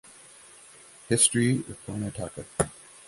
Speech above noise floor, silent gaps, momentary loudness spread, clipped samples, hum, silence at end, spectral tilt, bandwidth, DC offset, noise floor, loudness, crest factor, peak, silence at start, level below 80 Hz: 24 dB; none; 14 LU; under 0.1%; none; 0.25 s; -3.5 dB/octave; 12 kHz; under 0.1%; -51 dBFS; -26 LUFS; 24 dB; -6 dBFS; 1.1 s; -54 dBFS